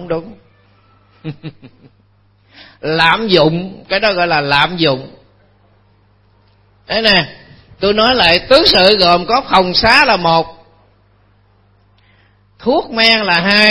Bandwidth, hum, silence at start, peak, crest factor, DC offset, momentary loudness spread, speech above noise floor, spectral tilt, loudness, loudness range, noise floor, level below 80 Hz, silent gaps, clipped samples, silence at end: 11 kHz; 50 Hz at -50 dBFS; 0 s; 0 dBFS; 14 dB; under 0.1%; 17 LU; 40 dB; -5 dB/octave; -11 LUFS; 7 LU; -52 dBFS; -40 dBFS; none; 0.2%; 0 s